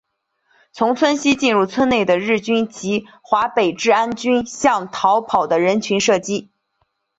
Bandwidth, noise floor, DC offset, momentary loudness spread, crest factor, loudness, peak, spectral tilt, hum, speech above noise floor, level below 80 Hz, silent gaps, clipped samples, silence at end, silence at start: 8.2 kHz; -69 dBFS; under 0.1%; 6 LU; 16 dB; -18 LUFS; -2 dBFS; -4 dB/octave; none; 51 dB; -56 dBFS; none; under 0.1%; 0.75 s; 0.75 s